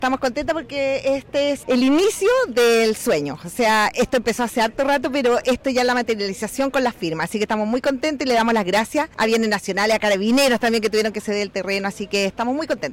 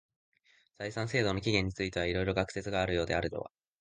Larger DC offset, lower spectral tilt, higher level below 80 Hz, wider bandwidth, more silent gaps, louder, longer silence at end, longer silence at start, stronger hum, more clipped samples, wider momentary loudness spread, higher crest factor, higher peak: neither; second, -3.5 dB/octave vs -5.5 dB/octave; about the same, -50 dBFS vs -50 dBFS; first, 16.5 kHz vs 9.8 kHz; neither; first, -20 LUFS vs -33 LUFS; second, 0 s vs 0.35 s; second, 0 s vs 0.8 s; neither; neither; second, 7 LU vs 10 LU; second, 10 dB vs 22 dB; about the same, -10 dBFS vs -12 dBFS